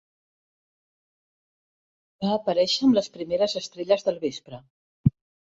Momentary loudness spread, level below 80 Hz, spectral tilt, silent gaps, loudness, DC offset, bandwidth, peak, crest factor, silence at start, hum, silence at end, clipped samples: 11 LU; -54 dBFS; -6 dB/octave; 4.70-5.04 s; -25 LUFS; under 0.1%; 8 kHz; -6 dBFS; 22 dB; 2.2 s; none; 0.45 s; under 0.1%